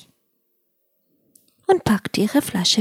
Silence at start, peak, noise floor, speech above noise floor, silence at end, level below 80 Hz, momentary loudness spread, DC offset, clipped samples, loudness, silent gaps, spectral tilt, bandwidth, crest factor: 1.7 s; -4 dBFS; -70 dBFS; 50 dB; 0 s; -54 dBFS; 3 LU; under 0.1%; under 0.1%; -20 LUFS; none; -4 dB/octave; 16.5 kHz; 20 dB